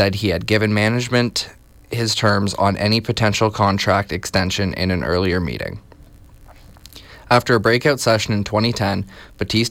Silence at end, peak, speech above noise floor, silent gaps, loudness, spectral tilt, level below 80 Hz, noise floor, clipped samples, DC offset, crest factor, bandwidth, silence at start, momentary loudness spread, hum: 0 s; -4 dBFS; 26 dB; none; -18 LUFS; -5 dB/octave; -44 dBFS; -44 dBFS; under 0.1%; under 0.1%; 16 dB; 16.5 kHz; 0 s; 10 LU; none